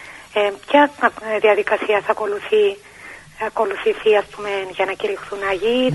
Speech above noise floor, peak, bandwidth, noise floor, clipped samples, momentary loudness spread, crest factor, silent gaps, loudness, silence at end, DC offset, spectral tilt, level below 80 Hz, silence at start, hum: 21 dB; 0 dBFS; 11.5 kHz; -40 dBFS; under 0.1%; 10 LU; 18 dB; none; -19 LUFS; 0 s; under 0.1%; -5 dB/octave; -56 dBFS; 0 s; none